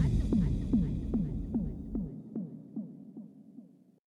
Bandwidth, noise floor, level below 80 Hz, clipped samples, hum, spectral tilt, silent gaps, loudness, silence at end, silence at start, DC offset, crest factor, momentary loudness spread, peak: 10 kHz; -55 dBFS; -40 dBFS; under 0.1%; none; -9.5 dB/octave; none; -34 LUFS; 0.4 s; 0 s; under 0.1%; 18 dB; 21 LU; -16 dBFS